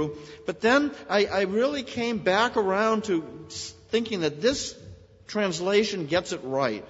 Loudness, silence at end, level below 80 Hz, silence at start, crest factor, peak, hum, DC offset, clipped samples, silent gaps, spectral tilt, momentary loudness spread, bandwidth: -26 LUFS; 0 s; -58 dBFS; 0 s; 18 dB; -8 dBFS; none; under 0.1%; under 0.1%; none; -4 dB/octave; 13 LU; 8 kHz